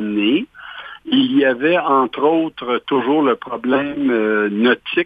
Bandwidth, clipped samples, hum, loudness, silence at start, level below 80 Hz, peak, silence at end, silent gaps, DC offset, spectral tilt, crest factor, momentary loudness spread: 4.9 kHz; under 0.1%; none; -17 LUFS; 0 s; -60 dBFS; -2 dBFS; 0 s; none; under 0.1%; -7.5 dB/octave; 14 dB; 7 LU